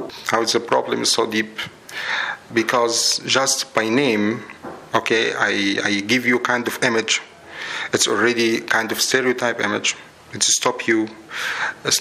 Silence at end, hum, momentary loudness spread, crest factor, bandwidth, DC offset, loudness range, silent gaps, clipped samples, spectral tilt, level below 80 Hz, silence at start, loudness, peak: 0 s; none; 11 LU; 20 dB; 16 kHz; under 0.1%; 1 LU; none; under 0.1%; -2 dB/octave; -66 dBFS; 0 s; -19 LUFS; 0 dBFS